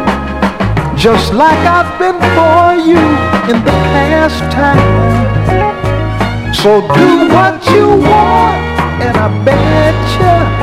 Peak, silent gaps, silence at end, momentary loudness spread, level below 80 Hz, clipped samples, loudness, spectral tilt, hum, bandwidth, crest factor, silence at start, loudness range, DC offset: 0 dBFS; none; 0 s; 7 LU; -24 dBFS; 1%; -9 LUFS; -6.5 dB/octave; none; 15 kHz; 8 dB; 0 s; 2 LU; under 0.1%